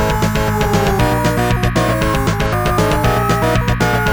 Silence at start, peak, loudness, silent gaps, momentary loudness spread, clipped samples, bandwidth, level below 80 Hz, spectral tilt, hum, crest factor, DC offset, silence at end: 0 s; 0 dBFS; -15 LUFS; none; 2 LU; under 0.1%; over 20 kHz; -24 dBFS; -5.5 dB/octave; none; 14 dB; 0.5%; 0 s